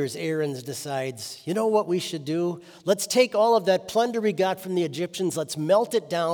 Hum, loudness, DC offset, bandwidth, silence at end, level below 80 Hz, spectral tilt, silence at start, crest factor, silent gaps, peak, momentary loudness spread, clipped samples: none; -25 LUFS; under 0.1%; over 20 kHz; 0 s; -74 dBFS; -4.5 dB/octave; 0 s; 18 dB; none; -6 dBFS; 9 LU; under 0.1%